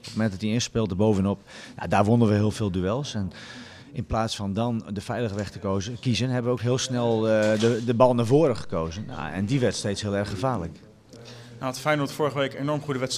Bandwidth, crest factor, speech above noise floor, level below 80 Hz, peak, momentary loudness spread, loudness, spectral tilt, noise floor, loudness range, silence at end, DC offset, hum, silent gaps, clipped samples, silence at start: 14.5 kHz; 20 dB; 21 dB; -50 dBFS; -4 dBFS; 13 LU; -25 LUFS; -6 dB/octave; -46 dBFS; 6 LU; 0 s; under 0.1%; none; none; under 0.1%; 0.05 s